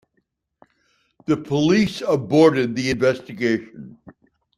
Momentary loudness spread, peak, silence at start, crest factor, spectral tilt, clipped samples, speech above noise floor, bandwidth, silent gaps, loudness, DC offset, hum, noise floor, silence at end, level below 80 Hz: 13 LU; -2 dBFS; 1.3 s; 18 dB; -6 dB/octave; under 0.1%; 52 dB; 12.5 kHz; none; -20 LUFS; under 0.1%; none; -71 dBFS; 0.5 s; -56 dBFS